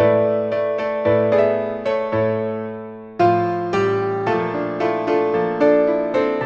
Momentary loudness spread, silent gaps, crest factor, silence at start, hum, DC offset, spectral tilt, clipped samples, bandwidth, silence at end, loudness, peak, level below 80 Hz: 7 LU; none; 14 dB; 0 s; none; under 0.1%; -8 dB/octave; under 0.1%; 7 kHz; 0 s; -19 LUFS; -4 dBFS; -56 dBFS